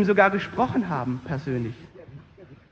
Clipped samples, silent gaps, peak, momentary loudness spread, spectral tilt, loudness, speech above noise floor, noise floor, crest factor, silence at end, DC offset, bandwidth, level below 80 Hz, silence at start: under 0.1%; none; -4 dBFS; 24 LU; -8 dB/octave; -25 LUFS; 25 dB; -49 dBFS; 22 dB; 0.15 s; under 0.1%; 7.6 kHz; -54 dBFS; 0 s